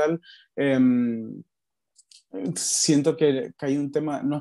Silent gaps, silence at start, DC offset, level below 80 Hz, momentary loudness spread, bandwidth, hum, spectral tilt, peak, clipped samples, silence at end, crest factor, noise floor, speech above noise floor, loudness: none; 0 s; under 0.1%; -74 dBFS; 17 LU; 12.5 kHz; none; -4.5 dB/octave; -8 dBFS; under 0.1%; 0 s; 16 dB; -64 dBFS; 40 dB; -24 LUFS